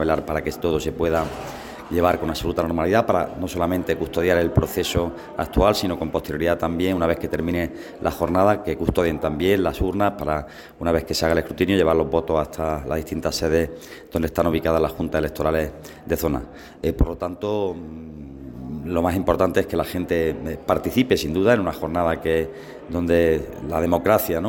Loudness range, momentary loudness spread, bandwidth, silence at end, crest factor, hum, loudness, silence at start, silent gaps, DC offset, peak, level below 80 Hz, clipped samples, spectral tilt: 3 LU; 10 LU; 17 kHz; 0 s; 18 dB; none; -22 LUFS; 0 s; none; under 0.1%; -4 dBFS; -36 dBFS; under 0.1%; -6 dB/octave